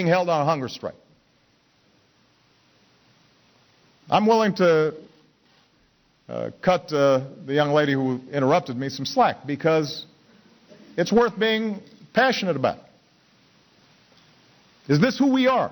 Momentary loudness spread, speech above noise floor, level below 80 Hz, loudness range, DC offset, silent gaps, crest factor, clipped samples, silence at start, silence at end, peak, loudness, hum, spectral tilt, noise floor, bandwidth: 13 LU; 41 dB; -62 dBFS; 5 LU; under 0.1%; none; 16 dB; under 0.1%; 0 s; 0 s; -8 dBFS; -22 LUFS; none; -6 dB/octave; -62 dBFS; over 20 kHz